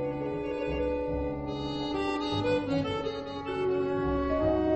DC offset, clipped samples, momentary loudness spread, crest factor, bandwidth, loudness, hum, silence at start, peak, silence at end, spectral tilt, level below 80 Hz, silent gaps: under 0.1%; under 0.1%; 6 LU; 14 dB; 8.4 kHz; -31 LUFS; none; 0 s; -16 dBFS; 0 s; -7 dB/octave; -44 dBFS; none